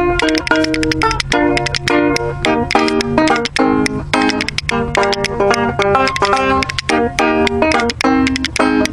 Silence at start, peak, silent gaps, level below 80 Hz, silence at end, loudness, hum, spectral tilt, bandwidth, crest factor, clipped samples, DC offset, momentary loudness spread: 0 s; 0 dBFS; none; -32 dBFS; 0 s; -14 LUFS; none; -4.5 dB/octave; 14.5 kHz; 14 dB; under 0.1%; under 0.1%; 3 LU